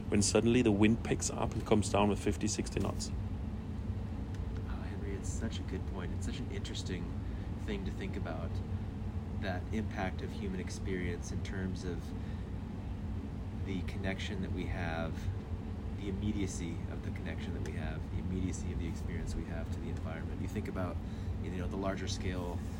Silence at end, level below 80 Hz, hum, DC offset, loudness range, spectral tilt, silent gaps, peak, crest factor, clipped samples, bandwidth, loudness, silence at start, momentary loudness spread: 0 s; -44 dBFS; none; under 0.1%; 5 LU; -5.5 dB/octave; none; -14 dBFS; 22 dB; under 0.1%; 16 kHz; -37 LUFS; 0 s; 10 LU